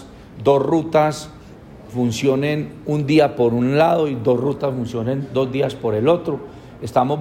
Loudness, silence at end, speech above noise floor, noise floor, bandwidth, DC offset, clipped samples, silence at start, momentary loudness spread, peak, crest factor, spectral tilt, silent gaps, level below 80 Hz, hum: -19 LUFS; 0 s; 22 dB; -40 dBFS; 16 kHz; under 0.1%; under 0.1%; 0 s; 10 LU; -4 dBFS; 14 dB; -7 dB/octave; none; -50 dBFS; none